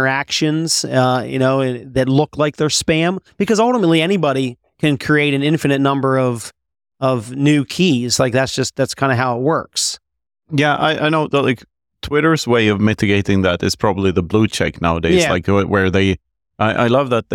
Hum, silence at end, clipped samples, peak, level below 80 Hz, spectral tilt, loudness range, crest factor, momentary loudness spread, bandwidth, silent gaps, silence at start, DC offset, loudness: none; 0 s; under 0.1%; -2 dBFS; -44 dBFS; -5 dB/octave; 2 LU; 14 dB; 6 LU; 17.5 kHz; none; 0 s; under 0.1%; -16 LUFS